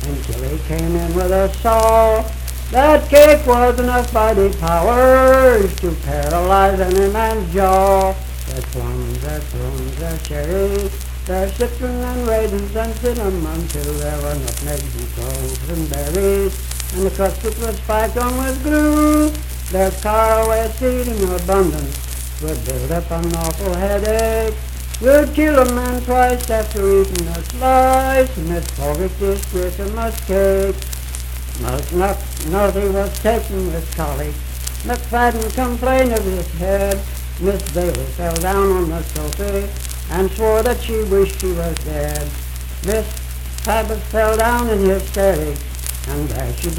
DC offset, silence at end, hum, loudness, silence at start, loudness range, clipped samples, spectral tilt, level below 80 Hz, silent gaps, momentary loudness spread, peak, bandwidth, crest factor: under 0.1%; 0 s; none; -17 LUFS; 0 s; 8 LU; under 0.1%; -5.5 dB/octave; -24 dBFS; none; 12 LU; 0 dBFS; 19 kHz; 16 dB